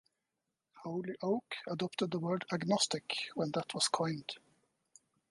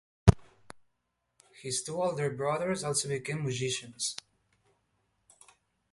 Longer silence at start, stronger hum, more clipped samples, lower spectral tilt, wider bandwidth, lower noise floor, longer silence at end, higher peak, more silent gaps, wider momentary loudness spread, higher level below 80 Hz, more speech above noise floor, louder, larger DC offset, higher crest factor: first, 0.75 s vs 0.25 s; neither; neither; about the same, -4 dB/octave vs -4.5 dB/octave; about the same, 11.5 kHz vs 11.5 kHz; first, -88 dBFS vs -80 dBFS; second, 0.95 s vs 1.75 s; second, -16 dBFS vs -2 dBFS; neither; about the same, 11 LU vs 9 LU; second, -80 dBFS vs -44 dBFS; first, 52 dB vs 47 dB; second, -36 LUFS vs -31 LUFS; neither; second, 22 dB vs 32 dB